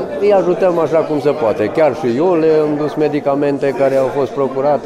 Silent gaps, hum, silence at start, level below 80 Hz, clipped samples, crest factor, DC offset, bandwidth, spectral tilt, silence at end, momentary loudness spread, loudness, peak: none; none; 0 s; -54 dBFS; under 0.1%; 10 dB; under 0.1%; 12.5 kHz; -7.5 dB/octave; 0 s; 4 LU; -14 LUFS; -4 dBFS